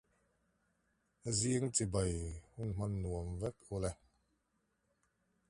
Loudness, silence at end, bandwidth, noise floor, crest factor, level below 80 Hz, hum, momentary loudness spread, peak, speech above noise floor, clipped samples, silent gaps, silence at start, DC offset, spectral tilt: -38 LUFS; 1.55 s; 11.5 kHz; -81 dBFS; 22 dB; -52 dBFS; none; 11 LU; -20 dBFS; 44 dB; under 0.1%; none; 1.25 s; under 0.1%; -5 dB/octave